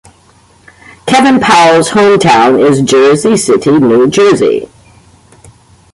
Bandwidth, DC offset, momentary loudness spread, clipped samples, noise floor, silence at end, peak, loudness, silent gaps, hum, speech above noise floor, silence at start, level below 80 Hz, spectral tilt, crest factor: 11.5 kHz; under 0.1%; 5 LU; under 0.1%; -44 dBFS; 1.3 s; 0 dBFS; -7 LUFS; none; none; 38 dB; 1.05 s; -46 dBFS; -4.5 dB/octave; 8 dB